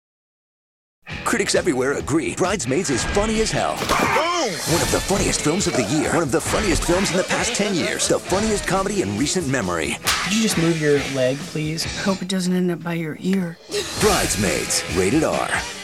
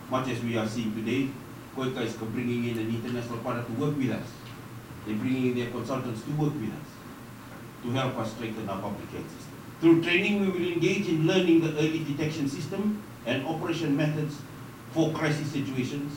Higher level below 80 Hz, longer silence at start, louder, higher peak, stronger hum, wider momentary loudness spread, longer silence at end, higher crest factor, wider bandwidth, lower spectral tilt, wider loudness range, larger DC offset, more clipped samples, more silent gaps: first, -38 dBFS vs -60 dBFS; first, 1.05 s vs 0 s; first, -20 LUFS vs -29 LUFS; first, -4 dBFS vs -10 dBFS; neither; second, 5 LU vs 18 LU; about the same, 0 s vs 0 s; about the same, 16 dB vs 18 dB; about the same, 16.5 kHz vs 17 kHz; second, -3.5 dB/octave vs -6 dB/octave; second, 2 LU vs 7 LU; first, 0.2% vs under 0.1%; neither; neither